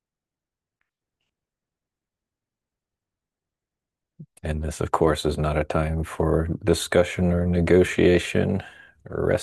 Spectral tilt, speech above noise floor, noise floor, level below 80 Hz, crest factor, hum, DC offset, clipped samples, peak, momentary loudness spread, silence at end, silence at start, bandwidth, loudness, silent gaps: -6 dB/octave; 68 dB; -90 dBFS; -42 dBFS; 20 dB; none; under 0.1%; under 0.1%; -4 dBFS; 11 LU; 0 s; 4.2 s; 12.5 kHz; -23 LUFS; none